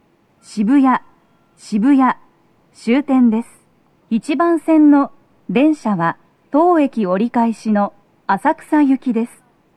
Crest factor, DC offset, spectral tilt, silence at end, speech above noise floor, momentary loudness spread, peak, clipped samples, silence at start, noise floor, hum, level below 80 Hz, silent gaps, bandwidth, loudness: 14 dB; under 0.1%; -7 dB/octave; 0.5 s; 41 dB; 11 LU; -2 dBFS; under 0.1%; 0.5 s; -56 dBFS; none; -68 dBFS; none; 11 kHz; -16 LUFS